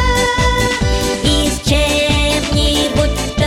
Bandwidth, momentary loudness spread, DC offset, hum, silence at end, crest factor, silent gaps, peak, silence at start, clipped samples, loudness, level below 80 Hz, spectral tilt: 16.5 kHz; 2 LU; under 0.1%; none; 0 s; 12 dB; none; -2 dBFS; 0 s; under 0.1%; -14 LUFS; -20 dBFS; -4 dB/octave